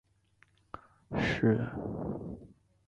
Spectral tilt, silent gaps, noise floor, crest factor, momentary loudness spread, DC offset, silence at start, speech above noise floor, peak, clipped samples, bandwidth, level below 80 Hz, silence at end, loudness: -7.5 dB/octave; none; -68 dBFS; 20 dB; 22 LU; under 0.1%; 0.75 s; 36 dB; -16 dBFS; under 0.1%; 8 kHz; -54 dBFS; 0.4 s; -33 LUFS